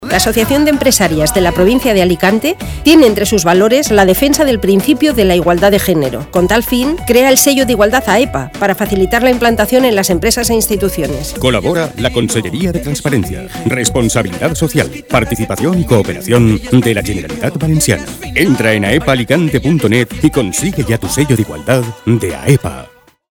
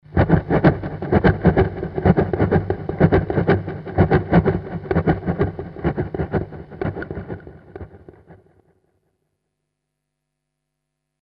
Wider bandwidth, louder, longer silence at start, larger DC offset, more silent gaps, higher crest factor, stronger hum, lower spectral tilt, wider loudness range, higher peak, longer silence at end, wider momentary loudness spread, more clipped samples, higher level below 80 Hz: first, 19.5 kHz vs 5.4 kHz; first, -11 LUFS vs -20 LUFS; about the same, 0 s vs 0.1 s; neither; neither; second, 12 dB vs 20 dB; second, none vs 50 Hz at -40 dBFS; second, -4.5 dB/octave vs -11 dB/octave; second, 5 LU vs 16 LU; about the same, 0 dBFS vs 0 dBFS; second, 0.5 s vs 2.9 s; second, 7 LU vs 16 LU; first, 0.3% vs under 0.1%; about the same, -30 dBFS vs -34 dBFS